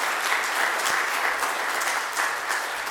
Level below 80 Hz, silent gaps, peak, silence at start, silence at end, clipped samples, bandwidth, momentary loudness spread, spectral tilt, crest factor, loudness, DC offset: -68 dBFS; none; -8 dBFS; 0 s; 0 s; under 0.1%; 19 kHz; 3 LU; 1 dB/octave; 18 dB; -24 LUFS; under 0.1%